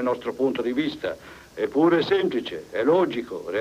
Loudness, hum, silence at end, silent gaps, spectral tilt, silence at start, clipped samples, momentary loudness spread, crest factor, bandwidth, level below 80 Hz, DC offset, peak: -24 LUFS; none; 0 s; none; -6.5 dB/octave; 0 s; under 0.1%; 12 LU; 14 dB; 14.5 kHz; -60 dBFS; under 0.1%; -10 dBFS